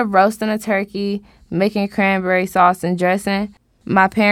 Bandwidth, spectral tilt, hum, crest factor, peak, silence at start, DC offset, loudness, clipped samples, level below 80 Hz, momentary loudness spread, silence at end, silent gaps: 15.5 kHz; -6 dB/octave; none; 18 dB; 0 dBFS; 0 s; under 0.1%; -17 LUFS; under 0.1%; -52 dBFS; 10 LU; 0 s; none